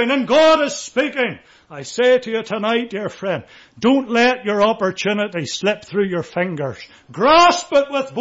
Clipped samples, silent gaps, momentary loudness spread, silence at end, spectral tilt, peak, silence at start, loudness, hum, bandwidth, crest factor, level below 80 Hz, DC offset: under 0.1%; none; 14 LU; 0 s; -4 dB/octave; -4 dBFS; 0 s; -17 LUFS; none; 8 kHz; 14 dB; -54 dBFS; under 0.1%